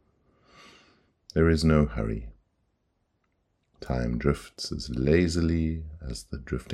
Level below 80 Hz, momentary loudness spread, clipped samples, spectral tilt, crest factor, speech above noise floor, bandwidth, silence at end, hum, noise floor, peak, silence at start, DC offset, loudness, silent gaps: -40 dBFS; 15 LU; under 0.1%; -6.5 dB/octave; 20 dB; 48 dB; 12.5 kHz; 0 s; none; -74 dBFS; -8 dBFS; 1.35 s; under 0.1%; -27 LUFS; none